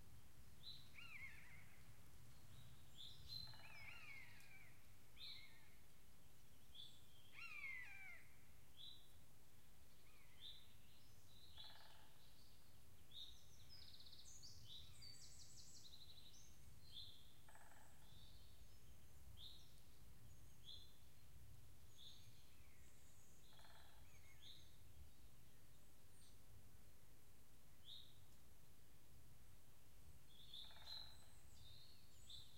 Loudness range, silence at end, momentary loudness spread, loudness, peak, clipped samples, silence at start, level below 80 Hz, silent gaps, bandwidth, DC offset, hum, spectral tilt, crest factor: 8 LU; 0 s; 12 LU; -62 LUFS; -42 dBFS; under 0.1%; 0 s; -74 dBFS; none; 16 kHz; 0.2%; none; -2 dB/octave; 22 dB